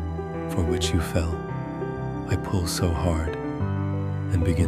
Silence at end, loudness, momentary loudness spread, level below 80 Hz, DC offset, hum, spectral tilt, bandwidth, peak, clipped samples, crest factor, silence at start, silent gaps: 0 s; -27 LUFS; 7 LU; -36 dBFS; under 0.1%; none; -6 dB/octave; 15 kHz; -8 dBFS; under 0.1%; 16 dB; 0 s; none